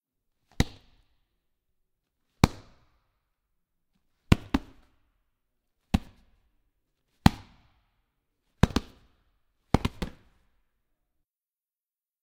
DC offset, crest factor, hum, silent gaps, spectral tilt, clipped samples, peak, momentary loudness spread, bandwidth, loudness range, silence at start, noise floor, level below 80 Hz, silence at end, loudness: under 0.1%; 34 dB; none; none; -6 dB/octave; under 0.1%; 0 dBFS; 9 LU; 16 kHz; 5 LU; 0.6 s; under -90 dBFS; -42 dBFS; 2.15 s; -29 LUFS